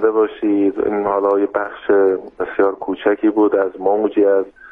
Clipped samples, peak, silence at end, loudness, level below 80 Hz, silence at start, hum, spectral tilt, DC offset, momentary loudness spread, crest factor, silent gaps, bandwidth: under 0.1%; -4 dBFS; 0.05 s; -17 LUFS; -56 dBFS; 0 s; none; -8.5 dB/octave; under 0.1%; 5 LU; 12 dB; none; 3.7 kHz